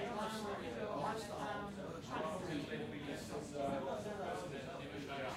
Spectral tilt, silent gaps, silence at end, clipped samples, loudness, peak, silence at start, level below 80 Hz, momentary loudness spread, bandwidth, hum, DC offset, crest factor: -5 dB/octave; none; 0 s; under 0.1%; -44 LUFS; -28 dBFS; 0 s; -66 dBFS; 5 LU; 16 kHz; none; under 0.1%; 14 dB